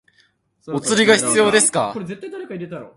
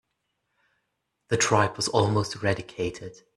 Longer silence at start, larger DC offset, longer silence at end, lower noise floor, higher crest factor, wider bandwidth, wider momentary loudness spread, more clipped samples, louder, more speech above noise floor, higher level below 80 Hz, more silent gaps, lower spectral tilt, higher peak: second, 0.65 s vs 1.3 s; neither; second, 0.1 s vs 0.25 s; second, -60 dBFS vs -79 dBFS; about the same, 20 dB vs 22 dB; about the same, 11.5 kHz vs 12.5 kHz; first, 17 LU vs 10 LU; neither; first, -16 LUFS vs -25 LUFS; second, 42 dB vs 53 dB; about the same, -62 dBFS vs -58 dBFS; neither; second, -2.5 dB/octave vs -4 dB/octave; first, 0 dBFS vs -6 dBFS